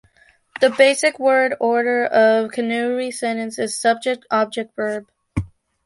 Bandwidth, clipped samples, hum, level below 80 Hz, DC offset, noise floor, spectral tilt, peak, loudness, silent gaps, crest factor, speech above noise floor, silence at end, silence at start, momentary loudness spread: 11.5 kHz; under 0.1%; none; -46 dBFS; under 0.1%; -56 dBFS; -4 dB/octave; -2 dBFS; -19 LUFS; none; 18 dB; 38 dB; 0.4 s; 0.6 s; 14 LU